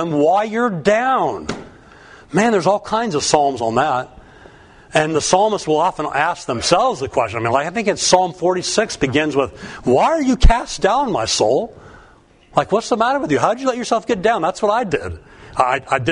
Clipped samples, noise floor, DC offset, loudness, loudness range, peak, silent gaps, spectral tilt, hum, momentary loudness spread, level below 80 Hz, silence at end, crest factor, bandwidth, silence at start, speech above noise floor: under 0.1%; -48 dBFS; under 0.1%; -17 LUFS; 2 LU; 0 dBFS; none; -4 dB/octave; none; 7 LU; -28 dBFS; 0 s; 18 dB; 11 kHz; 0 s; 32 dB